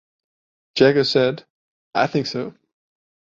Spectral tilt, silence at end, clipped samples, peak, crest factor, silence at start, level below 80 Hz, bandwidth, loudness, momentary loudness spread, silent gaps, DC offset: -5.5 dB/octave; 0.75 s; under 0.1%; -2 dBFS; 20 dB; 0.75 s; -62 dBFS; 7.6 kHz; -20 LUFS; 15 LU; 1.50-1.91 s; under 0.1%